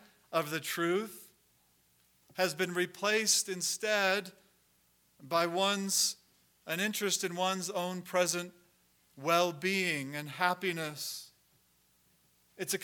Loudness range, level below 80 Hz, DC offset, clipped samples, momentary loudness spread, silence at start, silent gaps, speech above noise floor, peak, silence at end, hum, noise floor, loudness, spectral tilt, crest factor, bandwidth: 3 LU; -84 dBFS; under 0.1%; under 0.1%; 11 LU; 0.3 s; none; 38 dB; -12 dBFS; 0 s; 60 Hz at -65 dBFS; -70 dBFS; -32 LUFS; -2.5 dB/octave; 22 dB; 19 kHz